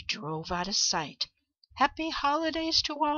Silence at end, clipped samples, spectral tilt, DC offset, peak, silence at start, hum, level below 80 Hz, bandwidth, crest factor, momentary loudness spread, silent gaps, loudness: 0 s; under 0.1%; -2 dB/octave; under 0.1%; -10 dBFS; 0 s; none; -54 dBFS; 7.6 kHz; 20 dB; 8 LU; none; -29 LUFS